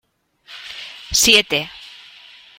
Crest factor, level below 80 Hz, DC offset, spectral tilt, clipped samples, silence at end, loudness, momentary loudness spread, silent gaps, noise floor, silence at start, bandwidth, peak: 22 dB; -48 dBFS; under 0.1%; -0.5 dB/octave; under 0.1%; 0.75 s; -14 LUFS; 25 LU; none; -50 dBFS; 0.5 s; 16.5 kHz; 0 dBFS